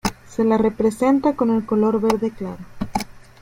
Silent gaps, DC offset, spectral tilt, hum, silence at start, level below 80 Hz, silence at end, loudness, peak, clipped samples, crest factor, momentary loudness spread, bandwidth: none; under 0.1%; -6 dB/octave; none; 0.05 s; -44 dBFS; 0.25 s; -20 LUFS; -2 dBFS; under 0.1%; 18 dB; 14 LU; 16.5 kHz